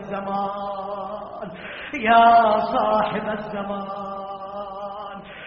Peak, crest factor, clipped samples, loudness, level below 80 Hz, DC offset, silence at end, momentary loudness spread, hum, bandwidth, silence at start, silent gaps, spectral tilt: -4 dBFS; 20 dB; under 0.1%; -21 LUFS; -54 dBFS; under 0.1%; 0 s; 19 LU; none; 5.8 kHz; 0 s; none; -3 dB/octave